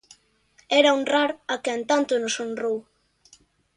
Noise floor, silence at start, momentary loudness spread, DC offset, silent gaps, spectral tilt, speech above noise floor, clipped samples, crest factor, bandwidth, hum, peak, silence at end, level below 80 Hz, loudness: -61 dBFS; 0.7 s; 10 LU; under 0.1%; none; -2 dB/octave; 39 dB; under 0.1%; 20 dB; 11 kHz; none; -6 dBFS; 0.95 s; -72 dBFS; -23 LUFS